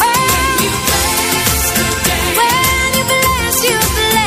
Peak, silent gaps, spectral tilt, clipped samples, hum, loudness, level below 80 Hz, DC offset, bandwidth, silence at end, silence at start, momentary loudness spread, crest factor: 0 dBFS; none; -2 dB/octave; under 0.1%; none; -12 LUFS; -26 dBFS; under 0.1%; 16 kHz; 0 s; 0 s; 2 LU; 14 dB